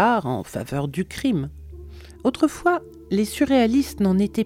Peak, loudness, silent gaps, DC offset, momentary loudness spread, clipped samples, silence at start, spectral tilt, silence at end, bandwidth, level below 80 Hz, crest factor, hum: -6 dBFS; -22 LUFS; none; under 0.1%; 16 LU; under 0.1%; 0 s; -6 dB/octave; 0 s; 16.5 kHz; -44 dBFS; 16 dB; none